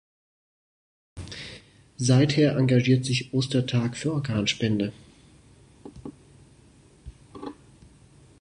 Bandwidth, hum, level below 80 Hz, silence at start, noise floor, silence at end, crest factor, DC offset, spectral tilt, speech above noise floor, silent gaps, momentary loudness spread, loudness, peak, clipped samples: 10.5 kHz; none; -54 dBFS; 1.15 s; -55 dBFS; 0.9 s; 20 dB; under 0.1%; -6 dB/octave; 32 dB; none; 23 LU; -24 LUFS; -8 dBFS; under 0.1%